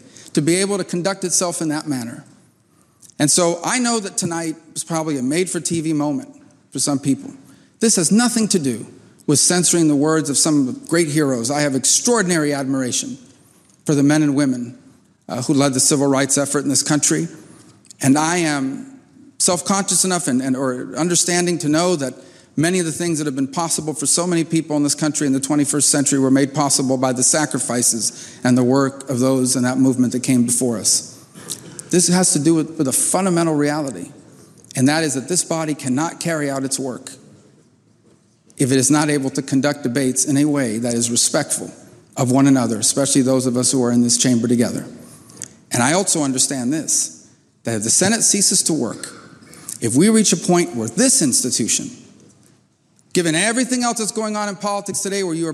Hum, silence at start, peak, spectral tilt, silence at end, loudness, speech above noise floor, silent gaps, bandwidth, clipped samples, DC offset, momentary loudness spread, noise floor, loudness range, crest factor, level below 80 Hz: none; 0.2 s; -4 dBFS; -3.5 dB/octave; 0 s; -17 LUFS; 40 dB; none; 15 kHz; under 0.1%; under 0.1%; 11 LU; -57 dBFS; 5 LU; 16 dB; -64 dBFS